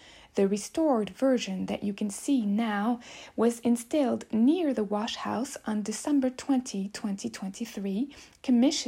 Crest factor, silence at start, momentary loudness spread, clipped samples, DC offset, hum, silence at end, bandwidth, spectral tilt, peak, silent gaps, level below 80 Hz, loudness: 16 dB; 0.05 s; 10 LU; under 0.1%; under 0.1%; none; 0 s; 15.5 kHz; -5 dB/octave; -12 dBFS; none; -66 dBFS; -29 LUFS